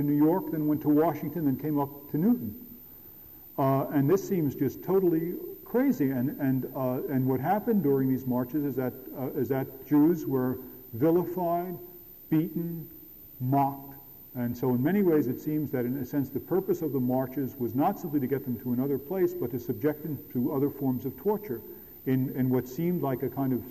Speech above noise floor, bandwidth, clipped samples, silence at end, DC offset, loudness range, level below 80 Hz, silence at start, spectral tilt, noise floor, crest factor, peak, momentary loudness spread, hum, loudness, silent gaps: 21 dB; 15 kHz; under 0.1%; 0 s; under 0.1%; 3 LU; -62 dBFS; 0 s; -9 dB/octave; -49 dBFS; 12 dB; -16 dBFS; 13 LU; none; -29 LUFS; none